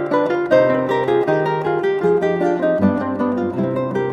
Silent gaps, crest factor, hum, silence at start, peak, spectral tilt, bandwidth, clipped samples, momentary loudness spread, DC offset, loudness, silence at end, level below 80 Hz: none; 14 dB; none; 0 s; -2 dBFS; -8 dB/octave; 8.4 kHz; under 0.1%; 5 LU; under 0.1%; -18 LUFS; 0 s; -58 dBFS